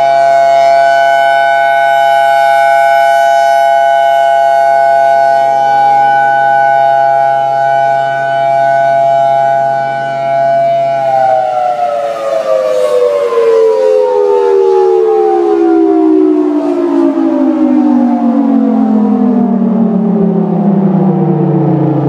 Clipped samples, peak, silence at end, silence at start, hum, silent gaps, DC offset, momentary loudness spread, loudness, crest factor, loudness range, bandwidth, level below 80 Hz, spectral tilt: under 0.1%; 0 dBFS; 0 s; 0 s; none; none; under 0.1%; 4 LU; -9 LUFS; 8 dB; 3 LU; 14.5 kHz; -60 dBFS; -7 dB/octave